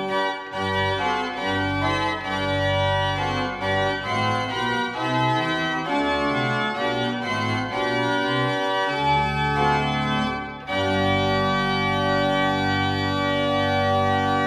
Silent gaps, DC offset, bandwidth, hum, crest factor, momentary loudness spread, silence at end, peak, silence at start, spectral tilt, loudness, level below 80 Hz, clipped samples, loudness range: none; under 0.1%; 13 kHz; none; 14 dB; 4 LU; 0 s; -8 dBFS; 0 s; -5.5 dB/octave; -23 LUFS; -46 dBFS; under 0.1%; 2 LU